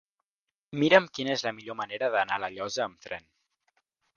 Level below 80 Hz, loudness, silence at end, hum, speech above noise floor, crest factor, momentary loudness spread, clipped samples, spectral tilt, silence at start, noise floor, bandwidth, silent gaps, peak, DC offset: -72 dBFS; -27 LUFS; 0.95 s; none; 62 dB; 26 dB; 18 LU; under 0.1%; -4 dB/octave; 0.7 s; -90 dBFS; 7.2 kHz; none; -4 dBFS; under 0.1%